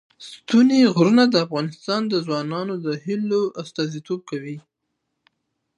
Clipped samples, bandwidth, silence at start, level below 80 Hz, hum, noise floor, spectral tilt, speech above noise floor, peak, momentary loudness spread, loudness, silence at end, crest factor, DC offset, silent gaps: under 0.1%; 9 kHz; 0.2 s; -72 dBFS; none; -77 dBFS; -6 dB/octave; 57 dB; -4 dBFS; 16 LU; -21 LUFS; 1.2 s; 18 dB; under 0.1%; none